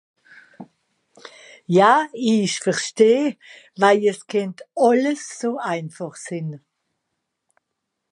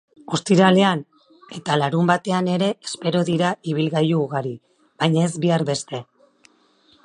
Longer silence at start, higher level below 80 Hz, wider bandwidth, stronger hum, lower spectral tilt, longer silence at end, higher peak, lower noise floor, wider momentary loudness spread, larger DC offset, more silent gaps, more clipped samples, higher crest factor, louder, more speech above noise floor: first, 0.6 s vs 0.3 s; second, -76 dBFS vs -66 dBFS; about the same, 11 kHz vs 11 kHz; neither; about the same, -5 dB/octave vs -6 dB/octave; first, 1.55 s vs 1 s; about the same, -2 dBFS vs -2 dBFS; first, -79 dBFS vs -58 dBFS; about the same, 16 LU vs 14 LU; neither; neither; neither; about the same, 20 dB vs 20 dB; about the same, -20 LUFS vs -20 LUFS; first, 59 dB vs 38 dB